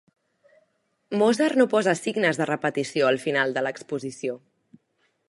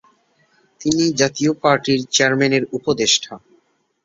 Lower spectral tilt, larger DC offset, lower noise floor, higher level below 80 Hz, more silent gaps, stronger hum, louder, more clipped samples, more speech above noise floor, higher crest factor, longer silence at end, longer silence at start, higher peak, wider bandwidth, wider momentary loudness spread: first, -5 dB/octave vs -3.5 dB/octave; neither; first, -71 dBFS vs -60 dBFS; second, -76 dBFS vs -56 dBFS; neither; neither; second, -24 LUFS vs -17 LUFS; neither; first, 47 dB vs 43 dB; about the same, 20 dB vs 18 dB; first, 0.9 s vs 0.65 s; first, 1.1 s vs 0.8 s; second, -6 dBFS vs -2 dBFS; first, 11.5 kHz vs 7.8 kHz; first, 12 LU vs 6 LU